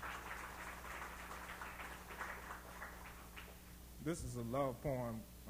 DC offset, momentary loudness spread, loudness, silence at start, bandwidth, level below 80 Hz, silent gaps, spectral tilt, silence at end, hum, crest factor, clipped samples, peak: under 0.1%; 13 LU; -47 LUFS; 0 s; over 20 kHz; -58 dBFS; none; -5 dB/octave; 0 s; 60 Hz at -60 dBFS; 20 dB; under 0.1%; -26 dBFS